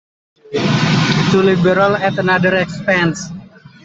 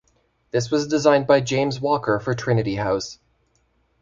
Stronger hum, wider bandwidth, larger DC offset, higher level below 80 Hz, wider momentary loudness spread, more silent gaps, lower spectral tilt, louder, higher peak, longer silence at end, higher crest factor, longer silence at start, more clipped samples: neither; about the same, 8 kHz vs 7.8 kHz; neither; about the same, -48 dBFS vs -52 dBFS; first, 11 LU vs 8 LU; neither; about the same, -5.5 dB/octave vs -5.5 dB/octave; first, -14 LUFS vs -21 LUFS; about the same, -2 dBFS vs -2 dBFS; second, 0.4 s vs 0.85 s; second, 14 dB vs 20 dB; about the same, 0.5 s vs 0.55 s; neither